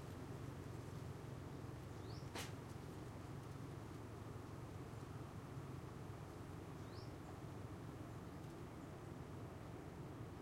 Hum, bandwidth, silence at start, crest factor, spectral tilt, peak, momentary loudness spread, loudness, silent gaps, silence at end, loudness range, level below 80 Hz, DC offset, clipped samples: none; 16 kHz; 0 s; 18 dB; -6 dB/octave; -34 dBFS; 2 LU; -53 LUFS; none; 0 s; 1 LU; -66 dBFS; under 0.1%; under 0.1%